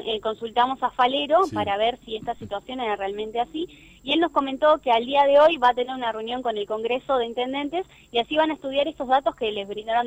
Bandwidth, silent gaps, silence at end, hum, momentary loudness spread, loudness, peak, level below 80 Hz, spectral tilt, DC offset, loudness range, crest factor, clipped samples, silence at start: 9.2 kHz; none; 0 s; none; 12 LU; -23 LUFS; -8 dBFS; -56 dBFS; -5 dB/octave; under 0.1%; 4 LU; 16 dB; under 0.1%; 0 s